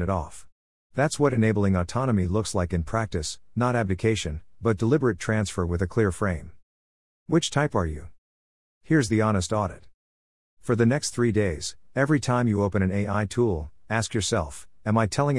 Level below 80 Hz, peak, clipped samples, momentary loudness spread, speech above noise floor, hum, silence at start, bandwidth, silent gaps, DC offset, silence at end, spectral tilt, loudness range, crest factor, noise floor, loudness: -46 dBFS; -8 dBFS; under 0.1%; 9 LU; over 66 dB; none; 0 s; 12 kHz; 0.52-0.90 s, 6.63-7.26 s, 8.18-8.81 s, 9.94-10.57 s; 0.4%; 0 s; -6 dB/octave; 2 LU; 18 dB; under -90 dBFS; -25 LUFS